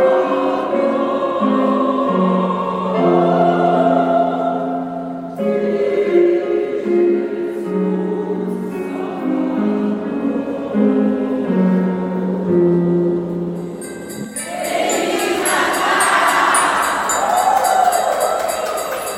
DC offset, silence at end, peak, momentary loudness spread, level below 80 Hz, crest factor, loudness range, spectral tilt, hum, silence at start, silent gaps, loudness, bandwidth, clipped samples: under 0.1%; 0 s; -2 dBFS; 9 LU; -54 dBFS; 14 dB; 5 LU; -5 dB/octave; none; 0 s; none; -17 LUFS; 16.5 kHz; under 0.1%